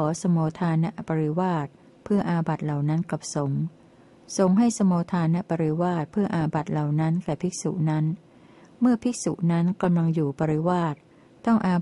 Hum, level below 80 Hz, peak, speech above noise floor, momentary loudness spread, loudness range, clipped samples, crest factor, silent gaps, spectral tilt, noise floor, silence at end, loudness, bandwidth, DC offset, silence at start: none; -60 dBFS; -10 dBFS; 29 dB; 7 LU; 2 LU; under 0.1%; 14 dB; none; -7 dB/octave; -53 dBFS; 0 s; -25 LUFS; 11.5 kHz; under 0.1%; 0 s